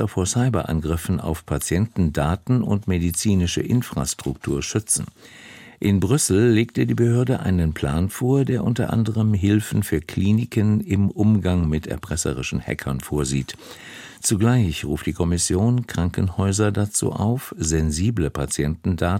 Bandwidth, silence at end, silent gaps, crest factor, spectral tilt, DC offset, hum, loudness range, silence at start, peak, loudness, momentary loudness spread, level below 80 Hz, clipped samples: 16.5 kHz; 0 s; none; 16 dB; -5.5 dB/octave; under 0.1%; none; 3 LU; 0 s; -6 dBFS; -21 LUFS; 7 LU; -38 dBFS; under 0.1%